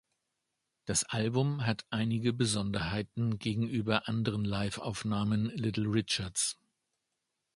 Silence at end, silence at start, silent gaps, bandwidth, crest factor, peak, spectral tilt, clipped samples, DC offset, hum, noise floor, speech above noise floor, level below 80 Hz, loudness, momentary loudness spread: 1.05 s; 0.85 s; none; 11.5 kHz; 22 dB; -12 dBFS; -4.5 dB/octave; under 0.1%; under 0.1%; none; -85 dBFS; 53 dB; -58 dBFS; -32 LUFS; 4 LU